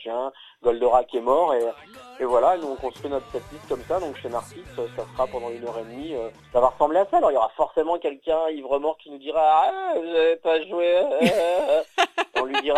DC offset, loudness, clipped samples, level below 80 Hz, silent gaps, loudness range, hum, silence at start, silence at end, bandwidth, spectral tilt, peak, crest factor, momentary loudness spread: under 0.1%; -23 LUFS; under 0.1%; -54 dBFS; none; 8 LU; none; 0 s; 0 s; 13.5 kHz; -4.5 dB/octave; -4 dBFS; 18 dB; 13 LU